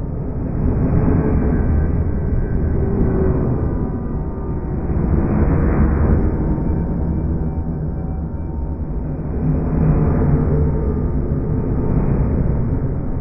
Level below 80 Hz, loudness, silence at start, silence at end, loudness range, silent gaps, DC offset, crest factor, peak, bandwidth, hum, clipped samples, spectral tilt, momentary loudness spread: -22 dBFS; -19 LUFS; 0 s; 0 s; 3 LU; none; under 0.1%; 14 dB; -2 dBFS; 2.6 kHz; none; under 0.1%; -13.5 dB/octave; 8 LU